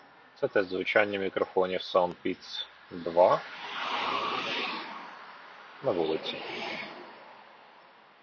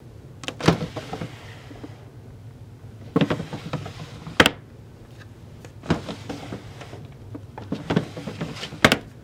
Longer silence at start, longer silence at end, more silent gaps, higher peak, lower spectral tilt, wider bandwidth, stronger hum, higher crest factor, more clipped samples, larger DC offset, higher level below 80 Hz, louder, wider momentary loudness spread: first, 0.4 s vs 0 s; first, 0.55 s vs 0 s; neither; second, -10 dBFS vs 0 dBFS; about the same, -5 dB/octave vs -4.5 dB/octave; second, 7 kHz vs 16.5 kHz; neither; about the same, 22 dB vs 26 dB; neither; neither; second, -70 dBFS vs -50 dBFS; second, -30 LUFS vs -25 LUFS; second, 21 LU vs 24 LU